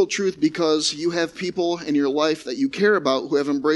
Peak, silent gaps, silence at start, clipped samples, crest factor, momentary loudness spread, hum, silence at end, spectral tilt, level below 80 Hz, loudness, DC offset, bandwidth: -6 dBFS; none; 0 s; under 0.1%; 16 dB; 5 LU; none; 0 s; -4 dB/octave; -62 dBFS; -21 LUFS; under 0.1%; 11.5 kHz